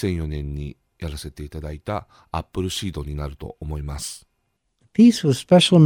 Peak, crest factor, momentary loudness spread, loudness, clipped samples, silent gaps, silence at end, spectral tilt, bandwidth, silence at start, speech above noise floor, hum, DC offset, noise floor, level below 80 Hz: -2 dBFS; 20 dB; 19 LU; -22 LUFS; under 0.1%; none; 0 s; -6 dB/octave; 17 kHz; 0 s; 51 dB; none; under 0.1%; -72 dBFS; -36 dBFS